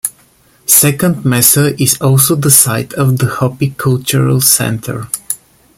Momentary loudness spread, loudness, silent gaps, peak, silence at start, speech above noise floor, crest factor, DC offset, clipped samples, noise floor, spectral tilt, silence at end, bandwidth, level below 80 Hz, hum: 13 LU; -10 LUFS; none; 0 dBFS; 0.05 s; 38 dB; 12 dB; under 0.1%; 0.4%; -48 dBFS; -4 dB/octave; 0.4 s; over 20 kHz; -46 dBFS; none